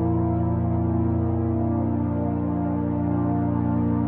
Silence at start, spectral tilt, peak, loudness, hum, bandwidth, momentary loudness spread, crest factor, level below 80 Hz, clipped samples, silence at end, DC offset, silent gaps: 0 s; -12 dB/octave; -12 dBFS; -24 LUFS; none; 3 kHz; 2 LU; 12 dB; -40 dBFS; under 0.1%; 0 s; under 0.1%; none